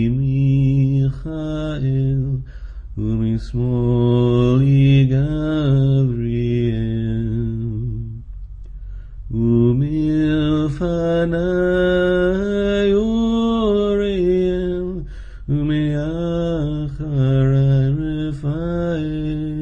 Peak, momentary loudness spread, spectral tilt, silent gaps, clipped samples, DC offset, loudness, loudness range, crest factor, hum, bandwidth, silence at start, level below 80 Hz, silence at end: -4 dBFS; 12 LU; -9 dB/octave; none; under 0.1%; under 0.1%; -18 LUFS; 5 LU; 14 dB; none; 7 kHz; 0 s; -32 dBFS; 0 s